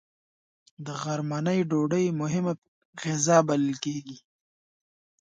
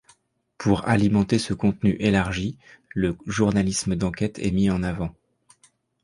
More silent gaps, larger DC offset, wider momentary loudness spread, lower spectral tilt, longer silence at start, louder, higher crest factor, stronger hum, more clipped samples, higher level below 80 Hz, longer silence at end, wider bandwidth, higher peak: first, 2.58-2.62 s, 2.68-2.93 s vs none; neither; first, 16 LU vs 8 LU; about the same, -5.5 dB/octave vs -6 dB/octave; first, 0.8 s vs 0.6 s; second, -26 LUFS vs -23 LUFS; about the same, 22 dB vs 20 dB; neither; neither; second, -70 dBFS vs -42 dBFS; about the same, 1 s vs 0.9 s; second, 9.4 kHz vs 11.5 kHz; second, -8 dBFS vs -4 dBFS